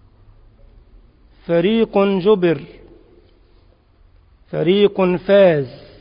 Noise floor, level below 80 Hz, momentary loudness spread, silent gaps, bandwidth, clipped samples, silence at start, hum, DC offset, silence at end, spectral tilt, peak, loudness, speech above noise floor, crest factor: -52 dBFS; -50 dBFS; 13 LU; none; 5.2 kHz; under 0.1%; 1.5 s; none; under 0.1%; 0.25 s; -11.5 dB/octave; -2 dBFS; -16 LUFS; 37 dB; 16 dB